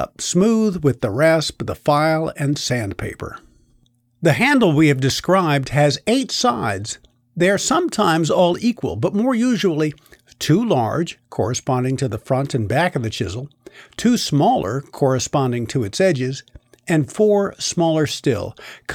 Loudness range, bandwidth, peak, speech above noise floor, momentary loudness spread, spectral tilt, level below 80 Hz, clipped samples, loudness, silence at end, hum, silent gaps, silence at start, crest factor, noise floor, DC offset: 3 LU; 17 kHz; -4 dBFS; 40 dB; 10 LU; -5 dB/octave; -50 dBFS; under 0.1%; -19 LUFS; 0 s; none; none; 0 s; 14 dB; -59 dBFS; under 0.1%